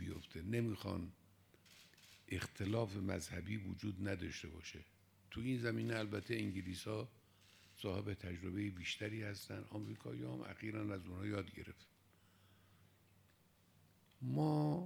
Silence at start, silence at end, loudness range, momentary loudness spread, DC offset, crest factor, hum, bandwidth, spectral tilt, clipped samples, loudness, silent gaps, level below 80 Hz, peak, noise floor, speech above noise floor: 0 s; 0 s; 5 LU; 14 LU; under 0.1%; 20 dB; none; over 20 kHz; -6 dB/octave; under 0.1%; -44 LUFS; none; -72 dBFS; -24 dBFS; -72 dBFS; 29 dB